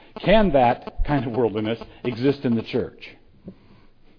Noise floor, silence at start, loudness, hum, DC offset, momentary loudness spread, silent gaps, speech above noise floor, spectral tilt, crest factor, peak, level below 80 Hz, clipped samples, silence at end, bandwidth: -50 dBFS; 0.15 s; -22 LUFS; none; under 0.1%; 13 LU; none; 29 dB; -9 dB/octave; 18 dB; -4 dBFS; -34 dBFS; under 0.1%; 0.65 s; 5.4 kHz